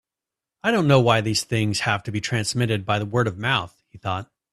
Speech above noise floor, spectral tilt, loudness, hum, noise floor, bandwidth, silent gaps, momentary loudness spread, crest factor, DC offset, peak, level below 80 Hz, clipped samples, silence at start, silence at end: 66 dB; -5 dB/octave; -22 LUFS; none; -88 dBFS; 13.5 kHz; none; 12 LU; 20 dB; under 0.1%; -2 dBFS; -54 dBFS; under 0.1%; 0.65 s; 0.3 s